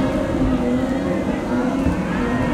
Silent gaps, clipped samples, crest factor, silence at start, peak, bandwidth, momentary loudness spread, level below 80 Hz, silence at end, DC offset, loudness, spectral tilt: none; under 0.1%; 14 dB; 0 s; -6 dBFS; 12.5 kHz; 2 LU; -32 dBFS; 0 s; under 0.1%; -21 LUFS; -7.5 dB/octave